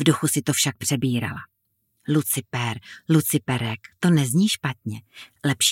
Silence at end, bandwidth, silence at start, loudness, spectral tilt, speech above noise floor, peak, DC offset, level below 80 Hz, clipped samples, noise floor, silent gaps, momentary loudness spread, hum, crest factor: 0 s; 17 kHz; 0 s; -23 LUFS; -4 dB/octave; 49 dB; -4 dBFS; under 0.1%; -62 dBFS; under 0.1%; -71 dBFS; none; 14 LU; none; 18 dB